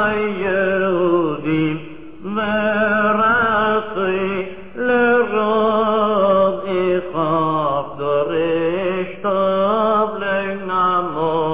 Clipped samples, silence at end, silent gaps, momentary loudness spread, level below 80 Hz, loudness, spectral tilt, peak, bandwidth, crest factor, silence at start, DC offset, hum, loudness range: under 0.1%; 0 s; none; 7 LU; -50 dBFS; -18 LUFS; -9.5 dB/octave; -4 dBFS; 4 kHz; 12 dB; 0 s; 1%; none; 2 LU